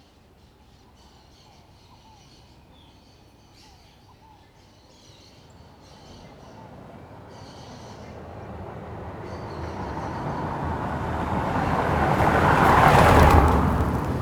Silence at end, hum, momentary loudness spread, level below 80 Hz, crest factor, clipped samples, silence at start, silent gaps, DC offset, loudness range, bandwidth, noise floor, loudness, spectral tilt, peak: 0 s; none; 28 LU; -36 dBFS; 22 dB; under 0.1%; 6.1 s; none; under 0.1%; 26 LU; 19 kHz; -54 dBFS; -21 LUFS; -6.5 dB/octave; -2 dBFS